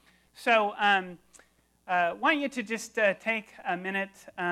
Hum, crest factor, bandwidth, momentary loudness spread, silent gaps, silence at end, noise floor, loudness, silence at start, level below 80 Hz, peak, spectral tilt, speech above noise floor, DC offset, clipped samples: none; 20 dB; 15 kHz; 9 LU; none; 0 s; -63 dBFS; -28 LUFS; 0.4 s; -74 dBFS; -10 dBFS; -3.5 dB/octave; 35 dB; under 0.1%; under 0.1%